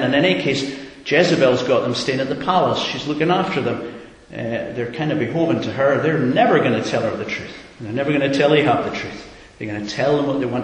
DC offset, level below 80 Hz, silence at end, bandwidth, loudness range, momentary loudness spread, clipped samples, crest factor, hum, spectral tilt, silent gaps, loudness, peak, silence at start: under 0.1%; -52 dBFS; 0 s; 10 kHz; 3 LU; 14 LU; under 0.1%; 18 dB; none; -5.5 dB/octave; none; -19 LUFS; -2 dBFS; 0 s